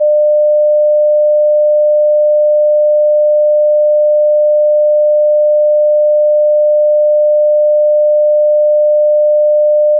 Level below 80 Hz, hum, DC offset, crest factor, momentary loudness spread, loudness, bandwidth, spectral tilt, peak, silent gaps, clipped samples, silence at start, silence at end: under -90 dBFS; none; under 0.1%; 4 dB; 0 LU; -10 LUFS; 0.8 kHz; -6.5 dB/octave; -6 dBFS; none; under 0.1%; 0 s; 0 s